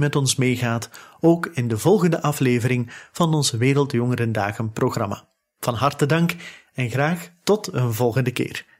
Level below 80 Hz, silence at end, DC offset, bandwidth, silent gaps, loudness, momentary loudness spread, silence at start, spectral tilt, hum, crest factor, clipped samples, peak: -58 dBFS; 0.15 s; under 0.1%; 16 kHz; none; -21 LUFS; 9 LU; 0 s; -5.5 dB/octave; none; 16 dB; under 0.1%; -4 dBFS